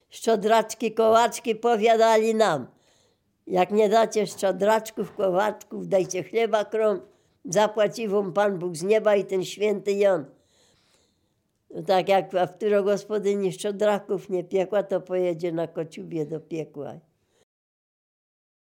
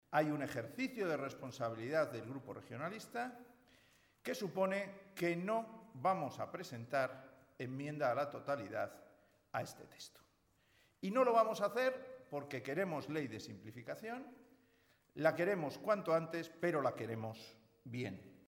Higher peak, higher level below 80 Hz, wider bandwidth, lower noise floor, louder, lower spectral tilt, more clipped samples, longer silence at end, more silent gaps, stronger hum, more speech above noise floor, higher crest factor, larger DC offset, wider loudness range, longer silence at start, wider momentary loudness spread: first, -6 dBFS vs -20 dBFS; first, -76 dBFS vs -82 dBFS; about the same, 17 kHz vs 17.5 kHz; about the same, -72 dBFS vs -75 dBFS; first, -24 LUFS vs -40 LUFS; second, -4.5 dB/octave vs -6 dB/octave; neither; first, 1.7 s vs 0.15 s; neither; neither; first, 48 dB vs 35 dB; about the same, 18 dB vs 20 dB; neither; about the same, 6 LU vs 5 LU; about the same, 0.15 s vs 0.1 s; second, 12 LU vs 15 LU